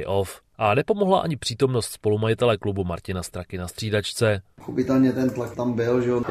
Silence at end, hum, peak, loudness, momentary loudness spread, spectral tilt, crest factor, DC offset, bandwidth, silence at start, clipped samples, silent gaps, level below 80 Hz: 0 s; none; -6 dBFS; -24 LUFS; 10 LU; -6 dB/octave; 18 dB; under 0.1%; 15 kHz; 0 s; under 0.1%; none; -54 dBFS